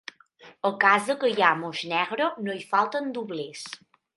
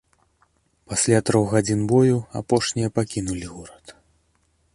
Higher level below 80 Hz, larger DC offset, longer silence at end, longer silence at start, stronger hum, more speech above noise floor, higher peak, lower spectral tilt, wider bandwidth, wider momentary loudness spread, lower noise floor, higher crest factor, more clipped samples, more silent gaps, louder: second, -80 dBFS vs -50 dBFS; neither; second, 0.4 s vs 0.85 s; second, 0.45 s vs 0.9 s; neither; second, 28 dB vs 44 dB; about the same, -4 dBFS vs -4 dBFS; second, -4 dB/octave vs -5.5 dB/octave; about the same, 11.5 kHz vs 11.5 kHz; first, 17 LU vs 14 LU; second, -53 dBFS vs -65 dBFS; about the same, 22 dB vs 20 dB; neither; neither; second, -25 LUFS vs -21 LUFS